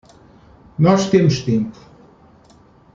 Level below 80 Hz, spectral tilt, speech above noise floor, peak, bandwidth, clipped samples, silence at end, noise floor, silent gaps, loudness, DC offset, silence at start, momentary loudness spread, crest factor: -50 dBFS; -7 dB/octave; 34 dB; -2 dBFS; 7.6 kHz; under 0.1%; 1.25 s; -49 dBFS; none; -17 LUFS; under 0.1%; 0.8 s; 14 LU; 18 dB